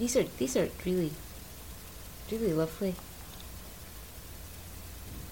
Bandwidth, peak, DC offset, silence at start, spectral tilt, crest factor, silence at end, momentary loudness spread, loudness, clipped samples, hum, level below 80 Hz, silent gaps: 17 kHz; -14 dBFS; 0.1%; 0 s; -5 dB/octave; 20 dB; 0 s; 15 LU; -35 LUFS; under 0.1%; none; -50 dBFS; none